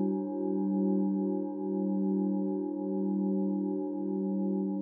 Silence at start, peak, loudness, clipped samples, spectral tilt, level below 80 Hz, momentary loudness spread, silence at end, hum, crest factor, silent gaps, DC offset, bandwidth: 0 s; -18 dBFS; -31 LUFS; under 0.1%; -15.5 dB/octave; under -90 dBFS; 4 LU; 0 s; none; 12 dB; none; under 0.1%; 1.7 kHz